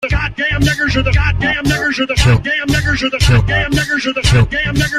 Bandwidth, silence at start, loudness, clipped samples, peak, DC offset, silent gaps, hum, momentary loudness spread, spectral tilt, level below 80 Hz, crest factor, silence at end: 15 kHz; 0 s; -14 LUFS; under 0.1%; 0 dBFS; under 0.1%; none; none; 3 LU; -5 dB/octave; -22 dBFS; 12 dB; 0 s